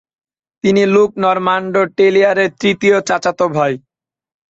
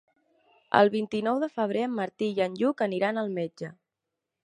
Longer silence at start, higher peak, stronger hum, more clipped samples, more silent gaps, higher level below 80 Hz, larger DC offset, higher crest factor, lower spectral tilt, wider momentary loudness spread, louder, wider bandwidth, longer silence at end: about the same, 0.65 s vs 0.7 s; about the same, -2 dBFS vs -4 dBFS; neither; neither; neither; first, -56 dBFS vs -76 dBFS; neither; second, 14 dB vs 24 dB; about the same, -5.5 dB/octave vs -6.5 dB/octave; second, 6 LU vs 10 LU; first, -14 LUFS vs -27 LUFS; second, 8 kHz vs 10.5 kHz; about the same, 0.75 s vs 0.7 s